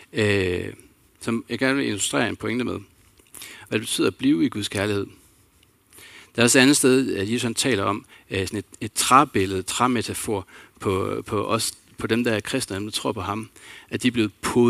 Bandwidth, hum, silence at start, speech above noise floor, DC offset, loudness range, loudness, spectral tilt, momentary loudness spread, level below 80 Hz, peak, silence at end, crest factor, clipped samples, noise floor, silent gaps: 16 kHz; none; 0.15 s; 36 dB; under 0.1%; 5 LU; -23 LUFS; -4 dB/octave; 15 LU; -58 dBFS; 0 dBFS; 0 s; 24 dB; under 0.1%; -59 dBFS; none